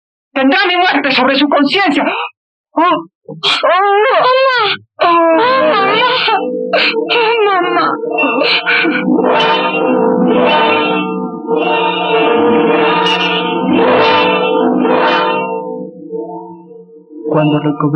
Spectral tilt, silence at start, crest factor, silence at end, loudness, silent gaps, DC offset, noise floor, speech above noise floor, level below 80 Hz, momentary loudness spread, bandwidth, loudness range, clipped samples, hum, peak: -6 dB/octave; 0.35 s; 10 dB; 0 s; -11 LUFS; 2.37-2.64 s, 3.15-3.21 s; under 0.1%; -36 dBFS; 25 dB; -60 dBFS; 9 LU; 9 kHz; 2 LU; under 0.1%; none; -2 dBFS